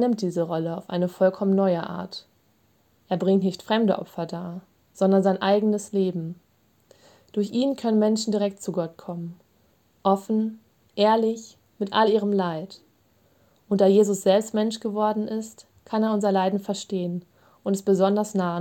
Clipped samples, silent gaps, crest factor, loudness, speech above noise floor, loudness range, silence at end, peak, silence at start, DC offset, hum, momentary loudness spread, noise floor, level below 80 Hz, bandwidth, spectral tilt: under 0.1%; none; 18 dB; -24 LUFS; 41 dB; 3 LU; 0 s; -8 dBFS; 0 s; under 0.1%; none; 14 LU; -64 dBFS; -72 dBFS; 16.5 kHz; -6 dB/octave